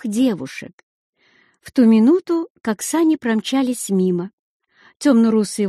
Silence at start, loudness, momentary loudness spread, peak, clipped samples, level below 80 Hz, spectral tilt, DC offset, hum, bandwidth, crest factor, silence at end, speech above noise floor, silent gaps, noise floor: 0.05 s; -18 LUFS; 11 LU; -4 dBFS; under 0.1%; -64 dBFS; -5.5 dB/octave; under 0.1%; none; 13 kHz; 14 dB; 0 s; 41 dB; 0.73-1.13 s, 2.50-2.55 s, 4.33-4.60 s; -58 dBFS